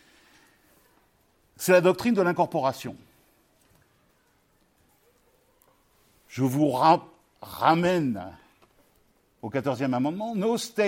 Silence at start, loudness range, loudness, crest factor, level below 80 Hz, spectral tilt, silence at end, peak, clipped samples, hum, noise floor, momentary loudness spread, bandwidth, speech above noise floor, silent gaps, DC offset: 1.6 s; 7 LU; -25 LUFS; 22 dB; -68 dBFS; -5.5 dB/octave; 0 s; -6 dBFS; under 0.1%; none; -66 dBFS; 20 LU; 16.5 kHz; 42 dB; none; under 0.1%